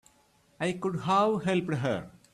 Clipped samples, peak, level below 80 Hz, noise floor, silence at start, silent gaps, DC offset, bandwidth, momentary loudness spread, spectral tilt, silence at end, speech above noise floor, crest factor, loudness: under 0.1%; -14 dBFS; -64 dBFS; -65 dBFS; 0.6 s; none; under 0.1%; 12.5 kHz; 8 LU; -6.5 dB/octave; 0.25 s; 37 dB; 16 dB; -29 LUFS